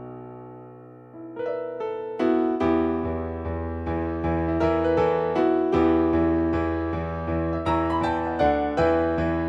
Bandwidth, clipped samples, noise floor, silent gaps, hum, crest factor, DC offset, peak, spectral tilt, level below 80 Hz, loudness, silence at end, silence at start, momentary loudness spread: 7.8 kHz; under 0.1%; -45 dBFS; none; none; 16 dB; under 0.1%; -8 dBFS; -8.5 dB/octave; -40 dBFS; -24 LUFS; 0 s; 0 s; 13 LU